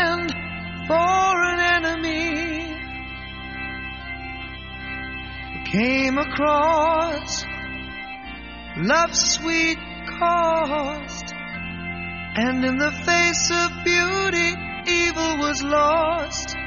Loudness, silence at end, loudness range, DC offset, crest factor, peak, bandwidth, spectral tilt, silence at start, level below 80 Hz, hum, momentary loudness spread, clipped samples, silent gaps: -22 LUFS; 0 s; 6 LU; 0.2%; 18 dB; -6 dBFS; 7.4 kHz; -2 dB/octave; 0 s; -42 dBFS; none; 14 LU; under 0.1%; none